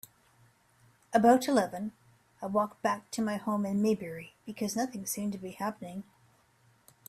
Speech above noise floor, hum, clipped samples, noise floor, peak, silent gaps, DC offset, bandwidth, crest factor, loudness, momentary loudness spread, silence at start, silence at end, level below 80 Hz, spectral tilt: 36 dB; none; under 0.1%; -66 dBFS; -12 dBFS; none; under 0.1%; 15.5 kHz; 22 dB; -31 LUFS; 18 LU; 1.1 s; 1.05 s; -72 dBFS; -5 dB/octave